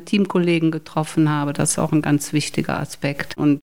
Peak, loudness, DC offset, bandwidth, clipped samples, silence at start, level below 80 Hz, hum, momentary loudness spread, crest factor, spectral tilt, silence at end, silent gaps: -6 dBFS; -20 LUFS; 0.8%; 16.5 kHz; under 0.1%; 0 s; -56 dBFS; none; 7 LU; 14 dB; -5.5 dB/octave; 0 s; none